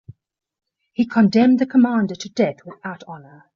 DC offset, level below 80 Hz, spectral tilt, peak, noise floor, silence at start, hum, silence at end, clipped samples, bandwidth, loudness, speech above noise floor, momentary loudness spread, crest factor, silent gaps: under 0.1%; -64 dBFS; -6 dB/octave; -6 dBFS; -46 dBFS; 1 s; none; 0.35 s; under 0.1%; 7.2 kHz; -18 LUFS; 28 dB; 20 LU; 14 dB; none